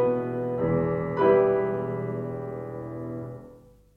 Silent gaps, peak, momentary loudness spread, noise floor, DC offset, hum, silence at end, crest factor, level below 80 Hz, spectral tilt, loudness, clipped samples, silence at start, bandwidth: none; -10 dBFS; 15 LU; -52 dBFS; under 0.1%; none; 0.4 s; 18 dB; -54 dBFS; -10 dB/octave; -26 LUFS; under 0.1%; 0 s; 4.3 kHz